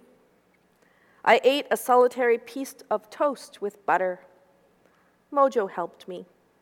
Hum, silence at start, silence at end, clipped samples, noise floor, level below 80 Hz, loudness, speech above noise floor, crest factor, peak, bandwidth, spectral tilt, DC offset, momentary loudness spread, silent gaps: none; 1.25 s; 0.4 s; under 0.1%; -64 dBFS; -80 dBFS; -24 LUFS; 40 dB; 22 dB; -4 dBFS; 17.5 kHz; -3.5 dB/octave; under 0.1%; 16 LU; none